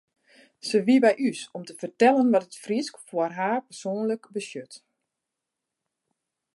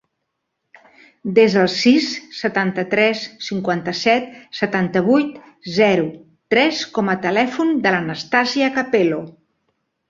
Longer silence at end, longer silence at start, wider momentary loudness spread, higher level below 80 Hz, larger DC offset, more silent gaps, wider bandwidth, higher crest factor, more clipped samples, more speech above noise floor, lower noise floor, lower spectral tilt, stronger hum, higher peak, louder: first, 1.8 s vs 0.8 s; second, 0.65 s vs 1.25 s; first, 17 LU vs 11 LU; second, -80 dBFS vs -62 dBFS; neither; neither; first, 11.5 kHz vs 7.6 kHz; about the same, 20 dB vs 18 dB; neither; about the same, 61 dB vs 58 dB; first, -85 dBFS vs -76 dBFS; about the same, -5 dB/octave vs -5 dB/octave; neither; second, -6 dBFS vs -2 dBFS; second, -24 LUFS vs -18 LUFS